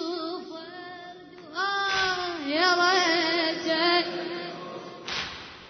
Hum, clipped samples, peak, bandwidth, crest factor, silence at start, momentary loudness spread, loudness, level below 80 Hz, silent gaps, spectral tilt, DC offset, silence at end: none; under 0.1%; -10 dBFS; 6.6 kHz; 18 dB; 0 s; 19 LU; -25 LUFS; -64 dBFS; none; -2.5 dB/octave; under 0.1%; 0 s